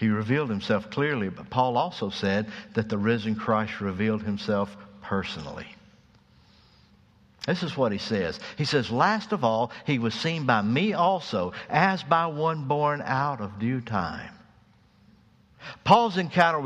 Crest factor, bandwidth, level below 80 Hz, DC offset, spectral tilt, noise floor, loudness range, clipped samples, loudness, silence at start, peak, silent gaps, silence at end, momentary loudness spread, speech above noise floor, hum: 22 dB; 9.6 kHz; -60 dBFS; under 0.1%; -6.5 dB/octave; -59 dBFS; 7 LU; under 0.1%; -26 LUFS; 0 s; -4 dBFS; none; 0 s; 9 LU; 33 dB; none